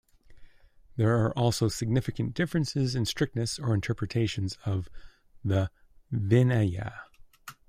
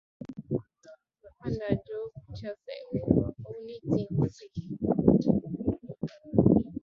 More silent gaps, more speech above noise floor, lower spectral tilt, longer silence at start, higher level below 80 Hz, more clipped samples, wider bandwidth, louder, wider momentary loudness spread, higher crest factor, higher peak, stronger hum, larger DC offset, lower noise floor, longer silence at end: neither; about the same, 27 dB vs 27 dB; second, -6 dB/octave vs -10 dB/octave; about the same, 0.3 s vs 0.2 s; about the same, -52 dBFS vs -50 dBFS; neither; first, 15.5 kHz vs 7 kHz; about the same, -28 LUFS vs -29 LUFS; second, 12 LU vs 18 LU; second, 18 dB vs 24 dB; second, -10 dBFS vs -6 dBFS; neither; neither; about the same, -55 dBFS vs -57 dBFS; about the same, 0.15 s vs 0.05 s